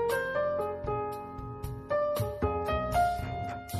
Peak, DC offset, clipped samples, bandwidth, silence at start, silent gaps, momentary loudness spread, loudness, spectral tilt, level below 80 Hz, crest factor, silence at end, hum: -16 dBFS; under 0.1%; under 0.1%; 13 kHz; 0 s; none; 11 LU; -32 LUFS; -6 dB/octave; -44 dBFS; 16 dB; 0 s; none